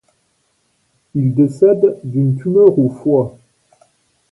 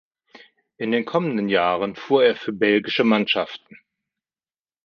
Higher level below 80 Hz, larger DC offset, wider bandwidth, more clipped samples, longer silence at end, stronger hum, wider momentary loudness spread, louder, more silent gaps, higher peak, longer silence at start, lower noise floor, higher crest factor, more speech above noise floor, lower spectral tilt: first, -58 dBFS vs -66 dBFS; neither; first, 11 kHz vs 6.6 kHz; neither; second, 1 s vs 1.3 s; neither; about the same, 7 LU vs 8 LU; first, -14 LUFS vs -21 LUFS; neither; first, 0 dBFS vs -4 dBFS; first, 1.15 s vs 0.35 s; second, -63 dBFS vs under -90 dBFS; about the same, 16 dB vs 18 dB; second, 50 dB vs over 69 dB; first, -11 dB/octave vs -7 dB/octave